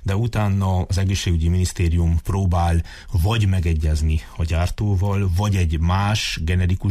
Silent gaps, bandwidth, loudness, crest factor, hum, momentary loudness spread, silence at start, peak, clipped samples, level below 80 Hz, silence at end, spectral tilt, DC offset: none; 14.5 kHz; -21 LUFS; 8 dB; none; 3 LU; 0 s; -10 dBFS; under 0.1%; -28 dBFS; 0 s; -6 dB/octave; under 0.1%